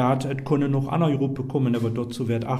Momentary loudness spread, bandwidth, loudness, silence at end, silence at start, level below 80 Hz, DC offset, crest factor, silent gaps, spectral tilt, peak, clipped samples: 4 LU; 13 kHz; -24 LUFS; 0 s; 0 s; -54 dBFS; under 0.1%; 14 dB; none; -8 dB/octave; -8 dBFS; under 0.1%